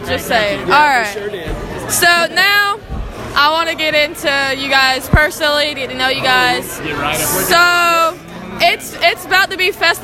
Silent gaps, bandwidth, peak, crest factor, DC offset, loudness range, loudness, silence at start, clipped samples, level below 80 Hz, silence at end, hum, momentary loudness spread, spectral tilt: none; 17 kHz; 0 dBFS; 14 dB; under 0.1%; 1 LU; -13 LUFS; 0 s; under 0.1%; -32 dBFS; 0 s; none; 12 LU; -2.5 dB/octave